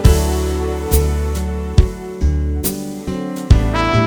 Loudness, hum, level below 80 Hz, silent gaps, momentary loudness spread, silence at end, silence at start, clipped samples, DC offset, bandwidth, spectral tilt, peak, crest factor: -18 LUFS; none; -18 dBFS; none; 9 LU; 0 s; 0 s; 0.2%; under 0.1%; over 20 kHz; -6 dB/octave; 0 dBFS; 16 dB